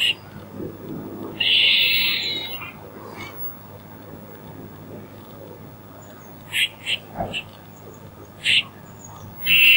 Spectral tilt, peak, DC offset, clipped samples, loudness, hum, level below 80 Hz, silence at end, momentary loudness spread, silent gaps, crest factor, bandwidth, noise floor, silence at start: -2 dB/octave; -2 dBFS; under 0.1%; under 0.1%; -19 LUFS; none; -56 dBFS; 0 s; 26 LU; none; 22 dB; 16.5 kHz; -42 dBFS; 0 s